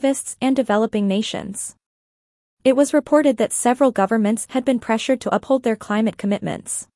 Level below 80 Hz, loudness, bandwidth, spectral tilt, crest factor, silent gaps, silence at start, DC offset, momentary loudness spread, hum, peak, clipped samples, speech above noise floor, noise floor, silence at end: -60 dBFS; -20 LUFS; 12 kHz; -4.5 dB/octave; 16 dB; 1.86-2.57 s; 0 s; under 0.1%; 9 LU; none; -4 dBFS; under 0.1%; over 71 dB; under -90 dBFS; 0.15 s